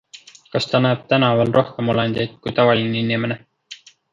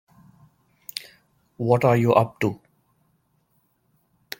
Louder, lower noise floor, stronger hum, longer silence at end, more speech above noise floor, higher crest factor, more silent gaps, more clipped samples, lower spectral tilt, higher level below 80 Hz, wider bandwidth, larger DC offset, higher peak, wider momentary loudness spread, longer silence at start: first, -19 LUFS vs -22 LUFS; second, -45 dBFS vs -68 dBFS; neither; second, 0.4 s vs 1.85 s; second, 27 dB vs 48 dB; second, 18 dB vs 24 dB; neither; neither; about the same, -6.5 dB/octave vs -7 dB/octave; first, -56 dBFS vs -62 dBFS; second, 7.6 kHz vs 17 kHz; neither; about the same, -2 dBFS vs -2 dBFS; about the same, 19 LU vs 20 LU; second, 0.15 s vs 0.95 s